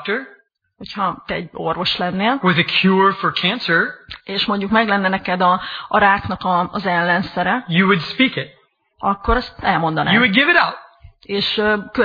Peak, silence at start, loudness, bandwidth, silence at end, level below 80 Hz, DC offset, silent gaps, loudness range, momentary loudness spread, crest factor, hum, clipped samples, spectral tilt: 0 dBFS; 0 s; -17 LUFS; 5.2 kHz; 0 s; -40 dBFS; under 0.1%; none; 2 LU; 10 LU; 18 dB; none; under 0.1%; -7 dB/octave